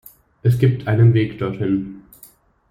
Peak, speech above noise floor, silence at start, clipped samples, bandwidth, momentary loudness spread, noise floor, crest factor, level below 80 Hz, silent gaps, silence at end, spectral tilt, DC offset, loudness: -2 dBFS; 33 dB; 0.45 s; under 0.1%; 15.5 kHz; 9 LU; -49 dBFS; 16 dB; -50 dBFS; none; 0.7 s; -9 dB/octave; under 0.1%; -18 LUFS